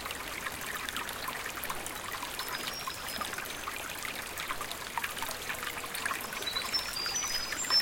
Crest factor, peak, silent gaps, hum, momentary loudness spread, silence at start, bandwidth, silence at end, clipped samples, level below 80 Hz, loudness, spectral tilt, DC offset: 20 dB; -16 dBFS; none; none; 6 LU; 0 s; 17 kHz; 0 s; under 0.1%; -58 dBFS; -34 LUFS; -0.5 dB/octave; under 0.1%